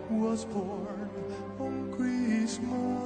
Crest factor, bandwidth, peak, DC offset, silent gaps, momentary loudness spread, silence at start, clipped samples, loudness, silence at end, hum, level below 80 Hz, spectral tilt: 14 dB; 9.4 kHz; -18 dBFS; under 0.1%; none; 9 LU; 0 s; under 0.1%; -33 LUFS; 0 s; none; -60 dBFS; -6 dB/octave